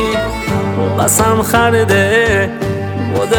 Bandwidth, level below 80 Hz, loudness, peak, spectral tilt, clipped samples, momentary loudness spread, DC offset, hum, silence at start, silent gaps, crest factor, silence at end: 19.5 kHz; -32 dBFS; -13 LUFS; 0 dBFS; -4.5 dB/octave; under 0.1%; 7 LU; under 0.1%; none; 0 s; none; 12 dB; 0 s